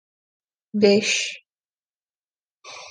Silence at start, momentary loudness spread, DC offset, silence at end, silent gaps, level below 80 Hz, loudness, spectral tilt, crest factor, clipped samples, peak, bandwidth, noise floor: 0.75 s; 23 LU; under 0.1%; 0 s; 1.65-1.77 s, 1.95-2.06 s, 2.16-2.28 s, 2.36-2.42 s, 2.50-2.56 s; -72 dBFS; -20 LUFS; -3.5 dB/octave; 22 dB; under 0.1%; -4 dBFS; 10 kHz; under -90 dBFS